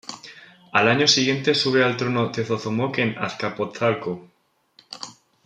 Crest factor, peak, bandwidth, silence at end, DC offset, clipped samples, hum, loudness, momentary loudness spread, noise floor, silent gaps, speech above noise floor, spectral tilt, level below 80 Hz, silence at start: 22 dB; -2 dBFS; 11 kHz; 0.35 s; under 0.1%; under 0.1%; none; -21 LUFS; 20 LU; -58 dBFS; none; 37 dB; -4 dB/octave; -66 dBFS; 0.05 s